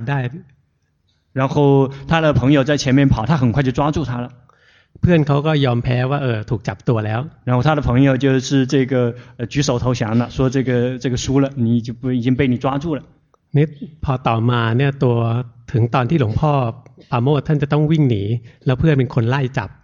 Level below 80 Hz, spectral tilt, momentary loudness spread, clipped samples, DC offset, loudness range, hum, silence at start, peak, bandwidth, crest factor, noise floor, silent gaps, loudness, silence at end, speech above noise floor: -40 dBFS; -7 dB/octave; 9 LU; under 0.1%; under 0.1%; 3 LU; none; 0 s; -2 dBFS; 7.4 kHz; 14 dB; -63 dBFS; none; -18 LUFS; 0.15 s; 47 dB